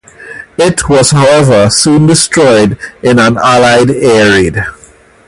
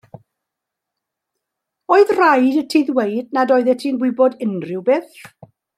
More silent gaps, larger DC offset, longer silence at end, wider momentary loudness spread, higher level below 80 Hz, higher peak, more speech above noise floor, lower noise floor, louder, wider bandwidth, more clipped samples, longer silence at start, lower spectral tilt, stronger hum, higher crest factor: neither; neither; about the same, 0.55 s vs 0.5 s; about the same, 10 LU vs 8 LU; first, -34 dBFS vs -70 dBFS; about the same, 0 dBFS vs -2 dBFS; second, 33 dB vs 66 dB; second, -39 dBFS vs -82 dBFS; first, -7 LUFS vs -16 LUFS; about the same, 13.5 kHz vs 14 kHz; first, 0.3% vs under 0.1%; second, 0.2 s vs 1.9 s; second, -4.5 dB/octave vs -6 dB/octave; neither; second, 8 dB vs 16 dB